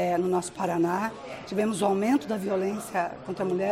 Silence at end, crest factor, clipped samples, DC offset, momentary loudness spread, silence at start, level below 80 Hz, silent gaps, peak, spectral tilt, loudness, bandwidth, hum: 0 s; 16 dB; under 0.1%; under 0.1%; 7 LU; 0 s; -62 dBFS; none; -12 dBFS; -5.5 dB/octave; -28 LUFS; 16 kHz; none